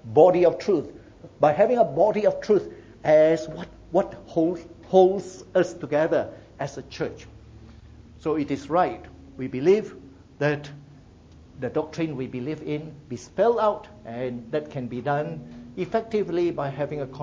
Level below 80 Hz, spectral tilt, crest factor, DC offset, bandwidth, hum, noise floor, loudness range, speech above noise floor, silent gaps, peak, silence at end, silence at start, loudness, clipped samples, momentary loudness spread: -54 dBFS; -7 dB/octave; 20 dB; under 0.1%; 7.8 kHz; none; -49 dBFS; 7 LU; 26 dB; none; -4 dBFS; 0 s; 0.05 s; -24 LUFS; under 0.1%; 17 LU